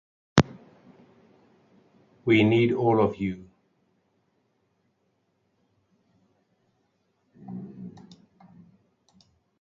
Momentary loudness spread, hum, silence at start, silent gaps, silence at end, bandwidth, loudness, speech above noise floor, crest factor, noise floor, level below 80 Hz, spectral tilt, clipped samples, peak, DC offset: 22 LU; none; 0.35 s; none; 1.7 s; 7.6 kHz; -24 LUFS; 51 dB; 30 dB; -73 dBFS; -56 dBFS; -6.5 dB/octave; under 0.1%; 0 dBFS; under 0.1%